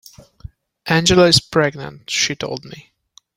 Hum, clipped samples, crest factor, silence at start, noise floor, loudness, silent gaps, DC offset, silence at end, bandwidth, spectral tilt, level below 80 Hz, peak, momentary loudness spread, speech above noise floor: none; under 0.1%; 18 dB; 0.85 s; -40 dBFS; -16 LUFS; none; under 0.1%; 0.55 s; 16.5 kHz; -3.5 dB/octave; -44 dBFS; 0 dBFS; 19 LU; 23 dB